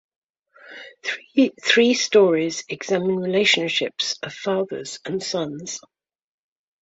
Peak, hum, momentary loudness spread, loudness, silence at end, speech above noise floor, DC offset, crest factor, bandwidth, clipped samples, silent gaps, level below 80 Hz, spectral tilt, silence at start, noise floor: -4 dBFS; none; 15 LU; -21 LUFS; 1.05 s; 28 dB; under 0.1%; 20 dB; 8 kHz; under 0.1%; none; -68 dBFS; -3.5 dB/octave; 0.65 s; -49 dBFS